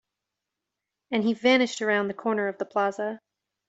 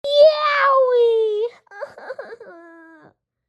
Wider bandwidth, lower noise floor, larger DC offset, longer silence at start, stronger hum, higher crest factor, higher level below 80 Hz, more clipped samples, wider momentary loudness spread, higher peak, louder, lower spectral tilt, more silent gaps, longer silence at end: about the same, 8 kHz vs 8.6 kHz; first, -86 dBFS vs -54 dBFS; neither; first, 1.1 s vs 0.05 s; neither; about the same, 18 dB vs 16 dB; about the same, -74 dBFS vs -72 dBFS; neither; second, 11 LU vs 22 LU; second, -10 dBFS vs -2 dBFS; second, -26 LUFS vs -16 LUFS; first, -4.5 dB/octave vs -2 dB/octave; neither; second, 0.5 s vs 0.95 s